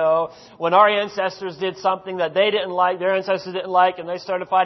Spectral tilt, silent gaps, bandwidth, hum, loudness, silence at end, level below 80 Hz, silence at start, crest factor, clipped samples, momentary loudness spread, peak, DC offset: -5 dB/octave; none; 6.2 kHz; none; -20 LUFS; 0 s; -70 dBFS; 0 s; 18 dB; under 0.1%; 11 LU; -2 dBFS; under 0.1%